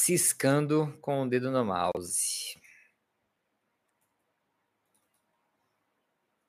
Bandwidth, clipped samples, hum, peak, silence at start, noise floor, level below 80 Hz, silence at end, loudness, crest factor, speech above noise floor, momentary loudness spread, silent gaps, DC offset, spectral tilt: 15.5 kHz; under 0.1%; none; -12 dBFS; 0 s; -79 dBFS; -72 dBFS; 3.95 s; -28 LUFS; 22 dB; 51 dB; 9 LU; none; under 0.1%; -4 dB/octave